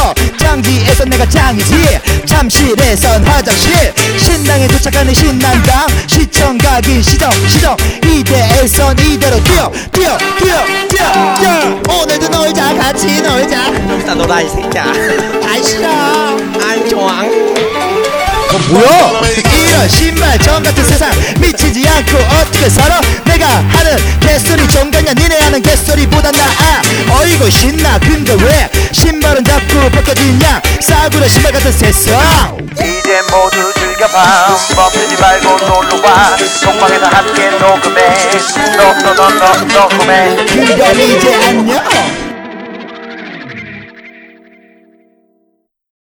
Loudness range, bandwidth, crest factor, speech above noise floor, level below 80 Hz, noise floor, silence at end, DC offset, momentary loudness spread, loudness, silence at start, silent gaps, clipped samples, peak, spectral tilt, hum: 4 LU; over 20 kHz; 8 dB; 52 dB; -16 dBFS; -60 dBFS; 1.9 s; under 0.1%; 5 LU; -8 LUFS; 0 s; none; 1%; 0 dBFS; -4 dB/octave; none